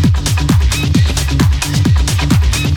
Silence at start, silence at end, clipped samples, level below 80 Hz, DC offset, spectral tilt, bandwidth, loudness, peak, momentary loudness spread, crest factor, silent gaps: 0 s; 0 s; under 0.1%; -16 dBFS; under 0.1%; -5 dB/octave; 19 kHz; -13 LUFS; 0 dBFS; 1 LU; 12 dB; none